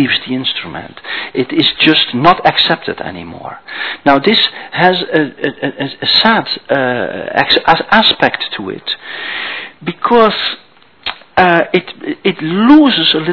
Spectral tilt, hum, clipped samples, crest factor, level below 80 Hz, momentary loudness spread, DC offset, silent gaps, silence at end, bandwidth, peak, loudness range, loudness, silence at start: -6.5 dB/octave; none; 0.8%; 12 dB; -48 dBFS; 15 LU; 0.4%; none; 0 s; 5.4 kHz; 0 dBFS; 3 LU; -12 LUFS; 0 s